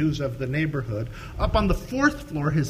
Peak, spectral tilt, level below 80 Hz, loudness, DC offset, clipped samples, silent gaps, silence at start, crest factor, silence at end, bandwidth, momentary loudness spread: -6 dBFS; -6.5 dB/octave; -34 dBFS; -26 LUFS; under 0.1%; under 0.1%; none; 0 s; 18 dB; 0 s; 15.5 kHz; 8 LU